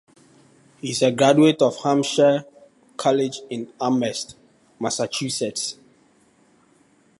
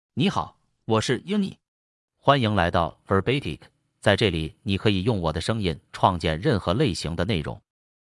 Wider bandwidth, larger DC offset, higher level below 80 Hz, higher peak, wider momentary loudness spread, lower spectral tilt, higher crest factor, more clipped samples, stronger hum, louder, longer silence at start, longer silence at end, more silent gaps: about the same, 11.5 kHz vs 12 kHz; neither; second, -70 dBFS vs -48 dBFS; about the same, -2 dBFS vs -2 dBFS; first, 16 LU vs 10 LU; second, -4.5 dB/octave vs -6 dB/octave; about the same, 20 dB vs 22 dB; neither; neither; first, -21 LUFS vs -24 LUFS; first, 0.85 s vs 0.15 s; first, 1.5 s vs 0.5 s; second, none vs 1.68-2.08 s